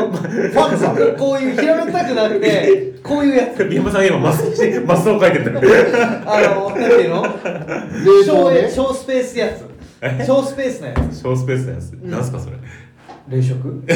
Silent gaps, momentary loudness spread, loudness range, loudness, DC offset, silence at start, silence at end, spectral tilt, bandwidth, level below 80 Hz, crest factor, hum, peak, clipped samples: none; 13 LU; 7 LU; -15 LUFS; under 0.1%; 0 s; 0 s; -6.5 dB/octave; 18.5 kHz; -40 dBFS; 12 dB; none; -4 dBFS; under 0.1%